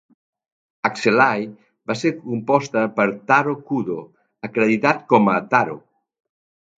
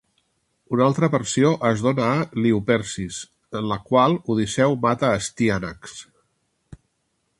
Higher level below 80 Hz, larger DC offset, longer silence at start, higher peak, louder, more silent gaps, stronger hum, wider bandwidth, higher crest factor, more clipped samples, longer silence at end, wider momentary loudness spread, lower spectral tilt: second, -66 dBFS vs -52 dBFS; neither; first, 0.85 s vs 0.7 s; first, 0 dBFS vs -4 dBFS; about the same, -19 LUFS vs -21 LUFS; neither; neither; second, 8 kHz vs 11.5 kHz; about the same, 20 dB vs 18 dB; neither; first, 1 s vs 0.65 s; about the same, 12 LU vs 14 LU; about the same, -6 dB/octave vs -5.5 dB/octave